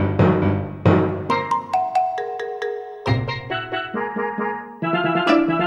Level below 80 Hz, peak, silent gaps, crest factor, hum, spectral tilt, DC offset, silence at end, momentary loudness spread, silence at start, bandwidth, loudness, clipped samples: -48 dBFS; -2 dBFS; none; 18 dB; none; -7.5 dB/octave; under 0.1%; 0 s; 10 LU; 0 s; 9.8 kHz; -21 LUFS; under 0.1%